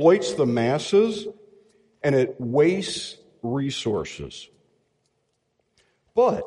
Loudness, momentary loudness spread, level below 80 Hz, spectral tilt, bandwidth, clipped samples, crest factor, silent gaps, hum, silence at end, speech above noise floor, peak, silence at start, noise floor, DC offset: -23 LUFS; 16 LU; -58 dBFS; -5.5 dB/octave; 11.5 kHz; under 0.1%; 20 dB; none; none; 0 s; 51 dB; -4 dBFS; 0 s; -73 dBFS; under 0.1%